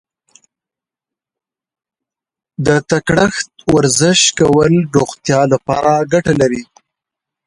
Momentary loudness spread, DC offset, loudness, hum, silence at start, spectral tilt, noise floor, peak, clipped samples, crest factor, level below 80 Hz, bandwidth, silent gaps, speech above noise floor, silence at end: 6 LU; under 0.1%; -13 LUFS; none; 2.6 s; -4.5 dB/octave; -87 dBFS; 0 dBFS; under 0.1%; 16 dB; -44 dBFS; 11.5 kHz; none; 74 dB; 0.85 s